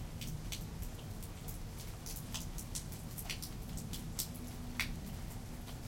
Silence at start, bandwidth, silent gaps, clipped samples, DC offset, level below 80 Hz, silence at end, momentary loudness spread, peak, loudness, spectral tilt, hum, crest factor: 0 s; 17 kHz; none; under 0.1%; under 0.1%; -48 dBFS; 0 s; 6 LU; -18 dBFS; -44 LUFS; -3.5 dB/octave; none; 24 dB